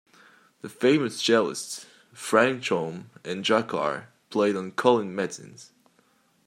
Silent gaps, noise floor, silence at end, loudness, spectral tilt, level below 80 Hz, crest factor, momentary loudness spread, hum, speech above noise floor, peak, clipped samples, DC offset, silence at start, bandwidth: none; -64 dBFS; 0.85 s; -25 LUFS; -4 dB/octave; -76 dBFS; 24 dB; 16 LU; none; 39 dB; -4 dBFS; under 0.1%; under 0.1%; 0.65 s; 15.5 kHz